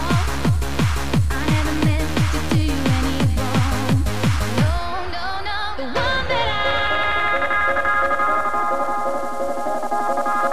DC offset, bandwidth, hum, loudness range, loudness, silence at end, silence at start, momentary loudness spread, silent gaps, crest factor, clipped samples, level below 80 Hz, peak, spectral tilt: 5%; 16 kHz; none; 2 LU; -20 LUFS; 0 s; 0 s; 6 LU; none; 12 dB; under 0.1%; -30 dBFS; -6 dBFS; -5.5 dB/octave